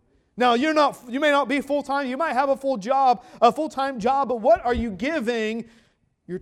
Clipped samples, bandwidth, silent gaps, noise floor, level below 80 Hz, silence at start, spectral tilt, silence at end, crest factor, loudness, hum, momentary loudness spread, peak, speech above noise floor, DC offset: under 0.1%; 14.5 kHz; none; -42 dBFS; -48 dBFS; 0.35 s; -5 dB/octave; 0 s; 20 dB; -22 LUFS; none; 6 LU; -4 dBFS; 20 dB; under 0.1%